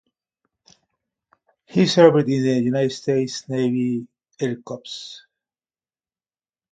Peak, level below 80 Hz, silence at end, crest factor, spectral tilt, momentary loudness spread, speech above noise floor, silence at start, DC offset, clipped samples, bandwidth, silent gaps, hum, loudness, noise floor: 0 dBFS; -66 dBFS; 1.55 s; 22 dB; -6 dB/octave; 18 LU; over 70 dB; 1.75 s; under 0.1%; under 0.1%; 9.2 kHz; none; none; -20 LUFS; under -90 dBFS